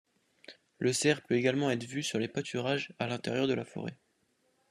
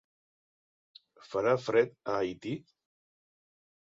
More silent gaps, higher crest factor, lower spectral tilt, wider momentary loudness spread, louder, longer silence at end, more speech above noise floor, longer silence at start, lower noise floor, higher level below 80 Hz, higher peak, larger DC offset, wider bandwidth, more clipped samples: neither; about the same, 20 dB vs 22 dB; second, -4.5 dB/octave vs -6 dB/octave; second, 7 LU vs 12 LU; about the same, -32 LUFS vs -31 LUFS; second, 0.75 s vs 1.3 s; second, 42 dB vs over 60 dB; second, 0.5 s vs 1.3 s; second, -74 dBFS vs under -90 dBFS; about the same, -74 dBFS vs -72 dBFS; about the same, -12 dBFS vs -12 dBFS; neither; first, 13 kHz vs 7.8 kHz; neither